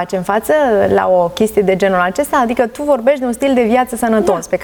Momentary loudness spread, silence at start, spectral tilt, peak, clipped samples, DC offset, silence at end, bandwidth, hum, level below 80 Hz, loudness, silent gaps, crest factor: 4 LU; 0 s; -5.5 dB/octave; -2 dBFS; under 0.1%; under 0.1%; 0 s; 20 kHz; none; -44 dBFS; -14 LUFS; none; 12 dB